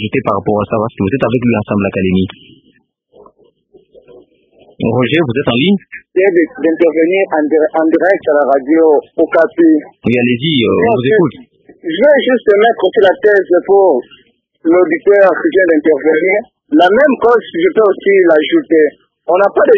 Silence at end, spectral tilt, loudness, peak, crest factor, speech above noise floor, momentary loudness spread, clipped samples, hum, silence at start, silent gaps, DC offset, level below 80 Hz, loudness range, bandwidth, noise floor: 0 s; -8.5 dB/octave; -11 LUFS; 0 dBFS; 12 dB; 43 dB; 7 LU; 0.1%; none; 0 s; none; under 0.1%; -46 dBFS; 7 LU; 5.2 kHz; -54 dBFS